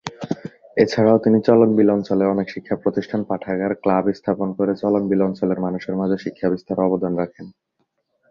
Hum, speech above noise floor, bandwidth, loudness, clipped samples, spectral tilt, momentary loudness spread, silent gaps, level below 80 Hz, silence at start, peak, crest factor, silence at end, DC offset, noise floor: none; 51 dB; 7.4 kHz; -20 LUFS; under 0.1%; -8 dB/octave; 10 LU; none; -56 dBFS; 0.05 s; 0 dBFS; 20 dB; 0.8 s; under 0.1%; -70 dBFS